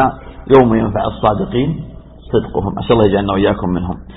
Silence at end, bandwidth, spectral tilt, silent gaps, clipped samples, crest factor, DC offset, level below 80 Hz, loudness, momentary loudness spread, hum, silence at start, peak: 0 s; 4 kHz; -10 dB/octave; none; under 0.1%; 14 dB; under 0.1%; -32 dBFS; -15 LUFS; 10 LU; none; 0 s; 0 dBFS